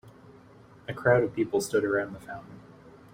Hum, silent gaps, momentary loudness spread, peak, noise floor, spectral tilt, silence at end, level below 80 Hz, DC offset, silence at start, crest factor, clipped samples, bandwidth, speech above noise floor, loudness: none; none; 19 LU; -10 dBFS; -53 dBFS; -6 dB/octave; 0.25 s; -62 dBFS; under 0.1%; 0.05 s; 20 dB; under 0.1%; 16 kHz; 26 dB; -27 LUFS